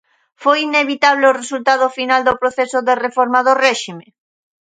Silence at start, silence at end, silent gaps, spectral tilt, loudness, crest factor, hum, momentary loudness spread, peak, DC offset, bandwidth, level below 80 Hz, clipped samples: 0.4 s; 0.65 s; none; -2.5 dB/octave; -15 LUFS; 16 dB; none; 6 LU; 0 dBFS; under 0.1%; 9.4 kHz; -58 dBFS; under 0.1%